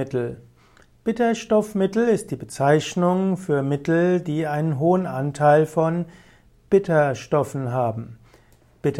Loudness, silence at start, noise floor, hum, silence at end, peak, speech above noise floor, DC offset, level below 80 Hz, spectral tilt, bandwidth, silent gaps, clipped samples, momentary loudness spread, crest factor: -22 LUFS; 0 s; -54 dBFS; none; 0 s; -6 dBFS; 33 dB; under 0.1%; -56 dBFS; -7 dB/octave; 14.5 kHz; none; under 0.1%; 10 LU; 16 dB